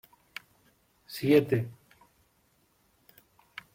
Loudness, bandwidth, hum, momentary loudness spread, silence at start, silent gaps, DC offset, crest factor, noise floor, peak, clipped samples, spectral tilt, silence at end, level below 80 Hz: -27 LUFS; 16.5 kHz; none; 23 LU; 1.1 s; none; under 0.1%; 22 dB; -69 dBFS; -10 dBFS; under 0.1%; -7 dB/octave; 2 s; -70 dBFS